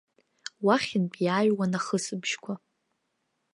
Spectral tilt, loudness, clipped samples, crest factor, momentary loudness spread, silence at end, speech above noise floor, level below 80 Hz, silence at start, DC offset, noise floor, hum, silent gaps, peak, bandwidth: -5 dB/octave; -27 LUFS; under 0.1%; 20 dB; 15 LU; 0.95 s; 51 dB; -76 dBFS; 0.6 s; under 0.1%; -78 dBFS; none; none; -8 dBFS; 11.5 kHz